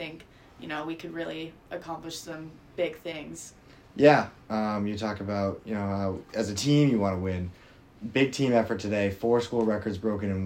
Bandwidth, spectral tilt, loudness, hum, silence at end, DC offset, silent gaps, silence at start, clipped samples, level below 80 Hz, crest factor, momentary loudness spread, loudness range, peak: 16 kHz; -6 dB/octave; -28 LUFS; none; 0 s; under 0.1%; none; 0 s; under 0.1%; -60 dBFS; 22 dB; 18 LU; 10 LU; -6 dBFS